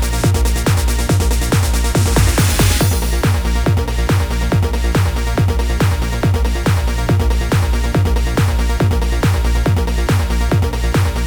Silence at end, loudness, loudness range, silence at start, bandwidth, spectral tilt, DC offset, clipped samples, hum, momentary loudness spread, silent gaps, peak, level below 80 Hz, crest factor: 0 s; -16 LUFS; 2 LU; 0 s; over 20 kHz; -5.5 dB/octave; 0.3%; under 0.1%; none; 3 LU; none; -2 dBFS; -18 dBFS; 12 dB